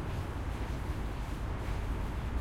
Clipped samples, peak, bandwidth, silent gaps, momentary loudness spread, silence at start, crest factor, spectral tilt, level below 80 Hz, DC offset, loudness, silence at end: under 0.1%; -22 dBFS; 15.5 kHz; none; 1 LU; 0 s; 12 dB; -6.5 dB/octave; -38 dBFS; under 0.1%; -38 LUFS; 0 s